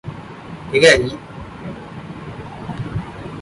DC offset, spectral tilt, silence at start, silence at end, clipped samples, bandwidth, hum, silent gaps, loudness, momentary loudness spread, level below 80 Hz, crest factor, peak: under 0.1%; -4 dB/octave; 0.05 s; 0 s; under 0.1%; 11.5 kHz; none; none; -16 LUFS; 22 LU; -42 dBFS; 20 dB; 0 dBFS